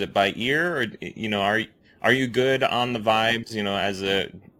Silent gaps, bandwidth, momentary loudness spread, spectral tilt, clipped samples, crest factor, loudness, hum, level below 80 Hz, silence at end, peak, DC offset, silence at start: none; 17 kHz; 7 LU; -4.5 dB/octave; under 0.1%; 20 dB; -23 LUFS; none; -58 dBFS; 0.2 s; -4 dBFS; under 0.1%; 0 s